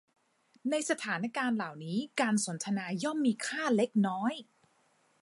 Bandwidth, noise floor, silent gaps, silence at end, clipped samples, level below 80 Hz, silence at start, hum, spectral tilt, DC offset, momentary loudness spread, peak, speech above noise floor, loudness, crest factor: 11.5 kHz; -70 dBFS; none; 0.8 s; under 0.1%; -84 dBFS; 0.65 s; none; -4.5 dB/octave; under 0.1%; 6 LU; -14 dBFS; 39 dB; -32 LUFS; 18 dB